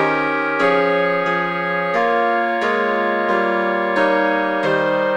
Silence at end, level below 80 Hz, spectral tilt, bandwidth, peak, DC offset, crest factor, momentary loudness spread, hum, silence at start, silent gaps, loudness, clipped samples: 0 s; -62 dBFS; -6 dB/octave; 9.2 kHz; -4 dBFS; under 0.1%; 14 dB; 3 LU; none; 0 s; none; -18 LUFS; under 0.1%